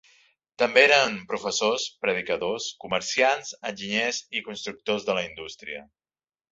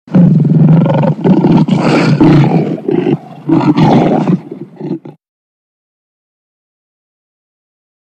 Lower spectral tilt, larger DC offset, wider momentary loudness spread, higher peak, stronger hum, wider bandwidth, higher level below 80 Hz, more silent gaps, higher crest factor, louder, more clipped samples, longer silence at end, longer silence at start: second, -2 dB/octave vs -9 dB/octave; neither; about the same, 17 LU vs 15 LU; about the same, -2 dBFS vs 0 dBFS; neither; about the same, 8 kHz vs 8.4 kHz; second, -66 dBFS vs -42 dBFS; neither; first, 24 dB vs 10 dB; second, -24 LUFS vs -9 LUFS; neither; second, 0.7 s vs 2.95 s; first, 0.6 s vs 0.05 s